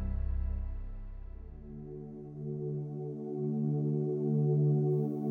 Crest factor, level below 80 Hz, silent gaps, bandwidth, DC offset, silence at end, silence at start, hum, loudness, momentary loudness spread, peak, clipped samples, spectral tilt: 12 dB; -42 dBFS; none; 2.1 kHz; under 0.1%; 0 s; 0 s; none; -33 LUFS; 19 LU; -20 dBFS; under 0.1%; -13 dB/octave